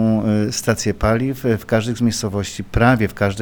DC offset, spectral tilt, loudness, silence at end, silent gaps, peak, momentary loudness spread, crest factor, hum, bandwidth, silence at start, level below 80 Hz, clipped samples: under 0.1%; -5.5 dB/octave; -19 LUFS; 0 s; none; -2 dBFS; 6 LU; 16 dB; none; over 20 kHz; 0 s; -34 dBFS; under 0.1%